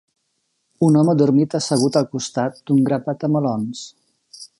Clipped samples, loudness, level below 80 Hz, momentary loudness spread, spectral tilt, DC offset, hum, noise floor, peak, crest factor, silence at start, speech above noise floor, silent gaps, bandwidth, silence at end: under 0.1%; -19 LUFS; -66 dBFS; 13 LU; -6.5 dB/octave; under 0.1%; none; -71 dBFS; -2 dBFS; 16 dB; 0.8 s; 53 dB; none; 11.5 kHz; 0.15 s